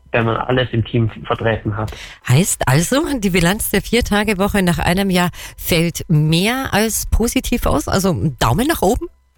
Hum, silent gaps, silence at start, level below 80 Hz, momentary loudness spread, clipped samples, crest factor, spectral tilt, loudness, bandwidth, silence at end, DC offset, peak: none; none; 0.15 s; -30 dBFS; 5 LU; under 0.1%; 12 dB; -5 dB/octave; -17 LUFS; 19 kHz; 0.3 s; under 0.1%; -4 dBFS